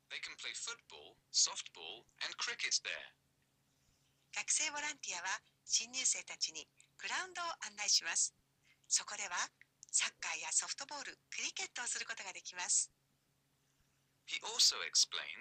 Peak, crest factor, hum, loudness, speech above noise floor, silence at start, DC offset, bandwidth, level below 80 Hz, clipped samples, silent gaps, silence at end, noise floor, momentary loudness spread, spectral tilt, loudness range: -22 dBFS; 18 dB; none; -37 LUFS; 39 dB; 0.1 s; under 0.1%; 15 kHz; -86 dBFS; under 0.1%; none; 0 s; -78 dBFS; 14 LU; 3 dB/octave; 4 LU